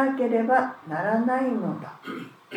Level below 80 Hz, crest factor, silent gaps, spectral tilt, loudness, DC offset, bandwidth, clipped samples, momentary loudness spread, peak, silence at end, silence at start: -86 dBFS; 18 dB; none; -7.5 dB/octave; -25 LUFS; under 0.1%; 10 kHz; under 0.1%; 15 LU; -6 dBFS; 0 s; 0 s